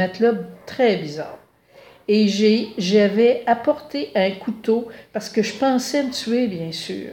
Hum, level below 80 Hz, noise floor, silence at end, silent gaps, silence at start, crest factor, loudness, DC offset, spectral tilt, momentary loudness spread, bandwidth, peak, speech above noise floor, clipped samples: none; -64 dBFS; -49 dBFS; 0 s; none; 0 s; 16 dB; -20 LUFS; under 0.1%; -5 dB/octave; 13 LU; 16.5 kHz; -4 dBFS; 29 dB; under 0.1%